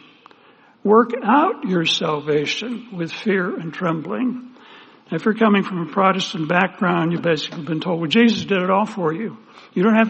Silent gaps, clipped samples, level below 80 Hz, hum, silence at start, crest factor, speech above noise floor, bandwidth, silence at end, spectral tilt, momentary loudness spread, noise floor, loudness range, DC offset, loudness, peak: none; under 0.1%; -66 dBFS; none; 0.85 s; 18 dB; 32 dB; 8.4 kHz; 0 s; -6 dB/octave; 10 LU; -51 dBFS; 4 LU; under 0.1%; -20 LUFS; -2 dBFS